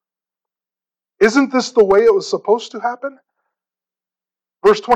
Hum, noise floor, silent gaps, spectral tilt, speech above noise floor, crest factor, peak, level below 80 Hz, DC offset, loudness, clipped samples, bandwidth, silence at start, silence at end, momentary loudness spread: none; under -90 dBFS; none; -4.5 dB/octave; over 75 dB; 16 dB; -2 dBFS; -54 dBFS; under 0.1%; -15 LUFS; under 0.1%; 8.6 kHz; 1.2 s; 0 s; 12 LU